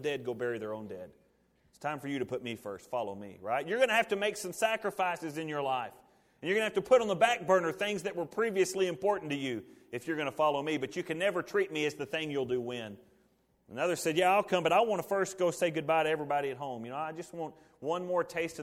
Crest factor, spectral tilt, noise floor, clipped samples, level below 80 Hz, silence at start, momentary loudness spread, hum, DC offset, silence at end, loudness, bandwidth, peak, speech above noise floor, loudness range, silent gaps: 22 dB; -4 dB/octave; -70 dBFS; under 0.1%; -72 dBFS; 0 s; 14 LU; none; under 0.1%; 0 s; -32 LUFS; 16.5 kHz; -12 dBFS; 38 dB; 5 LU; none